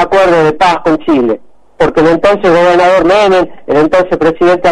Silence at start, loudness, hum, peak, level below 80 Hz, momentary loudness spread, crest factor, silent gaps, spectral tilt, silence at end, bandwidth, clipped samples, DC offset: 0 s; -9 LUFS; none; 0 dBFS; -36 dBFS; 5 LU; 8 dB; none; -6 dB/octave; 0 s; 11 kHz; under 0.1%; under 0.1%